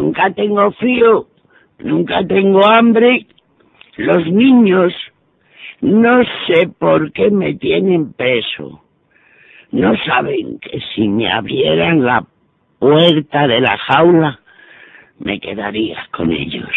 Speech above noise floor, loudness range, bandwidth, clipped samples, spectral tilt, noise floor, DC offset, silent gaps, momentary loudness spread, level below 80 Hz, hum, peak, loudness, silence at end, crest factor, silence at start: 40 dB; 5 LU; 4.2 kHz; under 0.1%; -8.5 dB/octave; -53 dBFS; under 0.1%; none; 12 LU; -50 dBFS; none; 0 dBFS; -13 LUFS; 0 s; 14 dB; 0 s